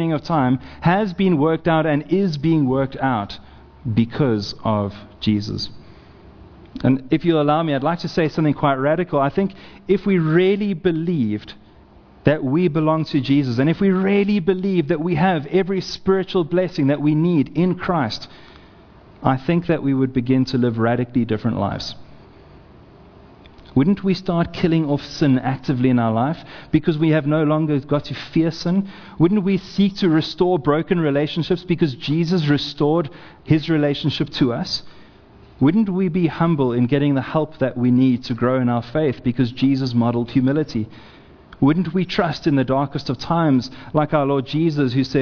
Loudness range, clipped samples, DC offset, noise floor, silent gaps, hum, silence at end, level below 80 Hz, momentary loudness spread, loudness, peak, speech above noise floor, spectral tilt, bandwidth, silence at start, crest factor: 3 LU; under 0.1%; under 0.1%; -47 dBFS; none; none; 0 s; -48 dBFS; 6 LU; -19 LUFS; 0 dBFS; 28 dB; -8 dB/octave; 5.4 kHz; 0 s; 20 dB